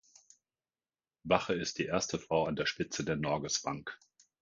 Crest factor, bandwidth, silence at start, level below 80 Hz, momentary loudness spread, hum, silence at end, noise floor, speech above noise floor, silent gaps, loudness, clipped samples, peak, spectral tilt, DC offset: 24 dB; 10 kHz; 1.25 s; -62 dBFS; 12 LU; none; 0.45 s; under -90 dBFS; over 56 dB; none; -34 LUFS; under 0.1%; -10 dBFS; -3.5 dB/octave; under 0.1%